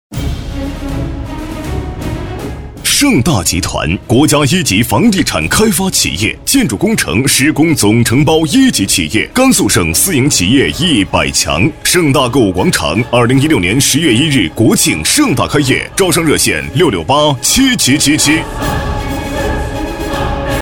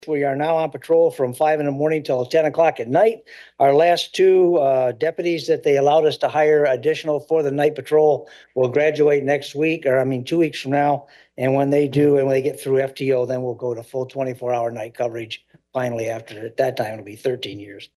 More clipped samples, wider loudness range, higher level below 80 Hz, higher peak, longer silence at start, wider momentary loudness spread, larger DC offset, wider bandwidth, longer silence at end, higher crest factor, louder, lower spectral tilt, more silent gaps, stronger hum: neither; second, 3 LU vs 8 LU; first, -28 dBFS vs -68 dBFS; first, 0 dBFS vs -4 dBFS; about the same, 0.1 s vs 0.05 s; about the same, 11 LU vs 11 LU; neither; first, over 20 kHz vs 12.5 kHz; about the same, 0 s vs 0.1 s; about the same, 12 dB vs 14 dB; first, -11 LUFS vs -19 LUFS; second, -4 dB/octave vs -6.5 dB/octave; neither; neither